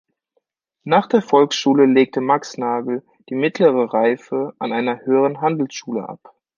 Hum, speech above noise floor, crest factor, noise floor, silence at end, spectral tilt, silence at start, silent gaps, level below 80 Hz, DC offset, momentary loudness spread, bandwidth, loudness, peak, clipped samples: none; 52 dB; 18 dB; -70 dBFS; 0.4 s; -5.5 dB/octave; 0.85 s; none; -70 dBFS; under 0.1%; 12 LU; 7.4 kHz; -18 LUFS; 0 dBFS; under 0.1%